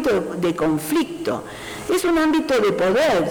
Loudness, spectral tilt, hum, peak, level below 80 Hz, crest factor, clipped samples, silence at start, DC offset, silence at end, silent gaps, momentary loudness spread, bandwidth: -20 LUFS; -5 dB/octave; none; -14 dBFS; -48 dBFS; 6 dB; under 0.1%; 0 s; under 0.1%; 0 s; none; 9 LU; over 20 kHz